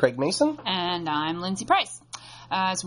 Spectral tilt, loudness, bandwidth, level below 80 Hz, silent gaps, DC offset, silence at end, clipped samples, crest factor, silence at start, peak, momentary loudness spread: -3.5 dB/octave; -25 LUFS; 11 kHz; -62 dBFS; none; under 0.1%; 0 s; under 0.1%; 18 dB; 0 s; -6 dBFS; 13 LU